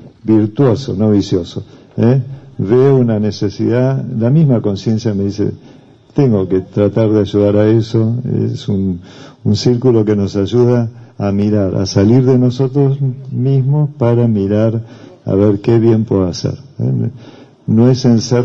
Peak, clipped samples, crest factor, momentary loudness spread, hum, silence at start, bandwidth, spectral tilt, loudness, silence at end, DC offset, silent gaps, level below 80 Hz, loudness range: 0 dBFS; under 0.1%; 12 dB; 10 LU; none; 0.05 s; 7.6 kHz; -8 dB/octave; -13 LUFS; 0 s; under 0.1%; none; -48 dBFS; 2 LU